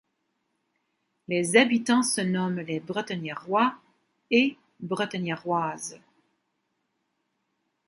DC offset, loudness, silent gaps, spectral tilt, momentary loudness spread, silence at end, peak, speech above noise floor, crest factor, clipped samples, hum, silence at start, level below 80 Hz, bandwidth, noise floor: under 0.1%; -26 LUFS; none; -4 dB/octave; 12 LU; 1.9 s; -4 dBFS; 51 dB; 24 dB; under 0.1%; none; 1.3 s; -74 dBFS; 11.5 kHz; -77 dBFS